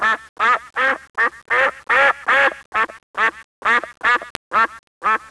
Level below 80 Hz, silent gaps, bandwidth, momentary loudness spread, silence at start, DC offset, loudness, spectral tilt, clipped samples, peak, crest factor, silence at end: -56 dBFS; 0.29-0.36 s, 1.10-1.14 s, 2.66-2.72 s, 3.03-3.14 s, 3.44-3.62 s, 4.30-4.51 s, 4.79-5.01 s; 11 kHz; 7 LU; 0 s; under 0.1%; -18 LUFS; -2 dB/octave; under 0.1%; 0 dBFS; 20 dB; 0.15 s